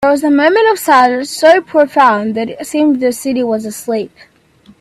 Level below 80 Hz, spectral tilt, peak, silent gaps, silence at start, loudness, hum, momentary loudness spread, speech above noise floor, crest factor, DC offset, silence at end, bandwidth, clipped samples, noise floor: -56 dBFS; -4 dB/octave; 0 dBFS; none; 0 s; -12 LUFS; none; 10 LU; 34 dB; 12 dB; under 0.1%; 0.75 s; 15.5 kHz; under 0.1%; -46 dBFS